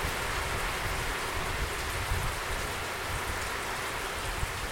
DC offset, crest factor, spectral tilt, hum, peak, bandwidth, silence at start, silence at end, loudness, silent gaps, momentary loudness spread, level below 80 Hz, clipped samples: under 0.1%; 14 dB; -3 dB/octave; none; -18 dBFS; 16.5 kHz; 0 s; 0 s; -32 LUFS; none; 2 LU; -40 dBFS; under 0.1%